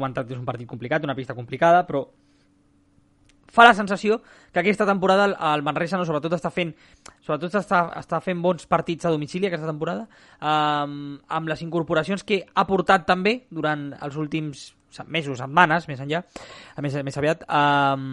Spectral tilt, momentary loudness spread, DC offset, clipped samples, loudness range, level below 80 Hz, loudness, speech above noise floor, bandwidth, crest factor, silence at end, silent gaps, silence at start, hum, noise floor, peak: -6 dB/octave; 13 LU; under 0.1%; under 0.1%; 5 LU; -58 dBFS; -23 LUFS; 38 dB; 11.5 kHz; 24 dB; 0 s; none; 0 s; none; -61 dBFS; 0 dBFS